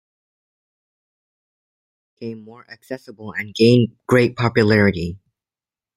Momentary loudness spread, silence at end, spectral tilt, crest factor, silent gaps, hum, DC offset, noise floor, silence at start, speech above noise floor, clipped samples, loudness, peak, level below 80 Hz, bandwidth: 19 LU; 0.8 s; -7 dB/octave; 20 dB; none; none; under 0.1%; under -90 dBFS; 2.2 s; over 72 dB; under 0.1%; -17 LUFS; -2 dBFS; -54 dBFS; 13 kHz